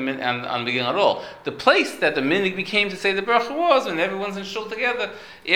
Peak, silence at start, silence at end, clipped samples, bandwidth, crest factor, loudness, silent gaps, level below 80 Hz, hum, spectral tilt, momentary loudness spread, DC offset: -2 dBFS; 0 s; 0 s; under 0.1%; 17.5 kHz; 20 dB; -21 LUFS; none; -62 dBFS; none; -4 dB/octave; 10 LU; under 0.1%